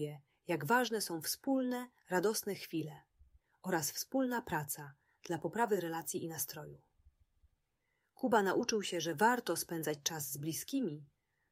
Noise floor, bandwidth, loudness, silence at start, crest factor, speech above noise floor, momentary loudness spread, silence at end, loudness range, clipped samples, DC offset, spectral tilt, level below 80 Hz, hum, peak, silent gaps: -83 dBFS; 16 kHz; -36 LUFS; 0 s; 22 dB; 46 dB; 12 LU; 0.45 s; 5 LU; under 0.1%; under 0.1%; -3.5 dB/octave; -74 dBFS; none; -16 dBFS; none